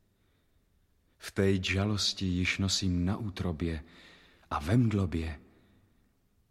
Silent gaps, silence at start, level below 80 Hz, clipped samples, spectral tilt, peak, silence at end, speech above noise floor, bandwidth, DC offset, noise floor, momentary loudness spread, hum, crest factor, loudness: none; 1.2 s; -50 dBFS; under 0.1%; -5 dB/octave; -14 dBFS; 1.1 s; 40 dB; 13.5 kHz; under 0.1%; -70 dBFS; 11 LU; none; 18 dB; -31 LUFS